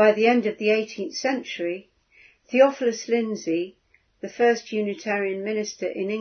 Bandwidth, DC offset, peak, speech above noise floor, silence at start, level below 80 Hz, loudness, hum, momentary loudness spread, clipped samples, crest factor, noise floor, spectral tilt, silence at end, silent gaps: 6.6 kHz; under 0.1%; -4 dBFS; 33 dB; 0 s; -74 dBFS; -24 LUFS; none; 11 LU; under 0.1%; 20 dB; -56 dBFS; -4.5 dB/octave; 0 s; none